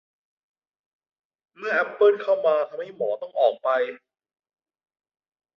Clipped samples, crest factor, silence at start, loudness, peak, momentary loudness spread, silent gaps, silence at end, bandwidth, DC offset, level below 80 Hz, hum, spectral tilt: under 0.1%; 18 dB; 1.6 s; -23 LUFS; -8 dBFS; 11 LU; none; 1.6 s; 6.2 kHz; under 0.1%; -80 dBFS; none; -5 dB/octave